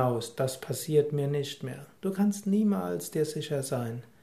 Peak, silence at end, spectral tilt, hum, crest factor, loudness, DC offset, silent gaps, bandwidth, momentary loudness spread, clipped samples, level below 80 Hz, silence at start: -12 dBFS; 0.2 s; -6 dB/octave; none; 18 dB; -30 LUFS; under 0.1%; none; 15.5 kHz; 10 LU; under 0.1%; -70 dBFS; 0 s